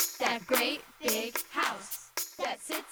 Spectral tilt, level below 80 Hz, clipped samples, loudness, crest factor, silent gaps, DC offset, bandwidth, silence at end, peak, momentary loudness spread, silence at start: -0.5 dB/octave; -72 dBFS; under 0.1%; -32 LUFS; 20 dB; none; under 0.1%; over 20 kHz; 0 s; -12 dBFS; 8 LU; 0 s